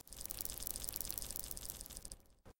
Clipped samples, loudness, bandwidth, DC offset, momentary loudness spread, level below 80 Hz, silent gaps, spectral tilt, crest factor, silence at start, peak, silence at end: under 0.1%; -43 LUFS; 17 kHz; under 0.1%; 10 LU; -56 dBFS; none; -1.5 dB/octave; 30 dB; 0.05 s; -16 dBFS; 0.05 s